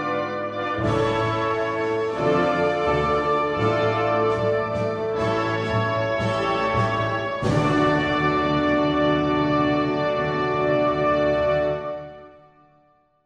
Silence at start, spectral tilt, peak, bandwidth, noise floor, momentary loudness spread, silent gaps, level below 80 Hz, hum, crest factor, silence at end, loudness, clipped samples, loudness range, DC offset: 0 s; -7 dB/octave; -8 dBFS; 10 kHz; -60 dBFS; 5 LU; none; -44 dBFS; none; 14 dB; 0.95 s; -22 LUFS; under 0.1%; 2 LU; under 0.1%